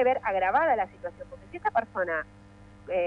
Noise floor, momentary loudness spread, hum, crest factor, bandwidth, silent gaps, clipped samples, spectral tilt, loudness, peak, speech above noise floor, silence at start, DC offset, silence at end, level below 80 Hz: -51 dBFS; 19 LU; none; 16 dB; 7.2 kHz; none; under 0.1%; -6.5 dB/octave; -28 LUFS; -12 dBFS; 23 dB; 0 s; under 0.1%; 0 s; -58 dBFS